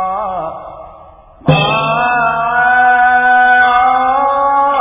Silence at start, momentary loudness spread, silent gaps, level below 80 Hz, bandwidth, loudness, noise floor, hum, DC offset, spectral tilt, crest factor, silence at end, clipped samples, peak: 0 s; 12 LU; none; -42 dBFS; 3.8 kHz; -11 LUFS; -38 dBFS; none; under 0.1%; -8.5 dB/octave; 12 dB; 0 s; under 0.1%; 0 dBFS